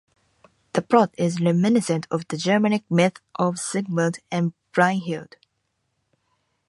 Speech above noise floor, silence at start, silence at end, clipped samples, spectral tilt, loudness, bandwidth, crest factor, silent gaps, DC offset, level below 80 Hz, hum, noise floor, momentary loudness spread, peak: 53 dB; 0.75 s; 1.45 s; under 0.1%; -6 dB/octave; -22 LUFS; 11.5 kHz; 20 dB; none; under 0.1%; -68 dBFS; none; -74 dBFS; 9 LU; -2 dBFS